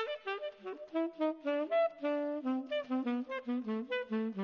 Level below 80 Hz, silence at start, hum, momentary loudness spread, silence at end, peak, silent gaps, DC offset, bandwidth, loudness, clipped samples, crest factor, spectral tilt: -82 dBFS; 0 s; none; 7 LU; 0 s; -20 dBFS; none; under 0.1%; 6.6 kHz; -36 LUFS; under 0.1%; 14 dB; -3.5 dB/octave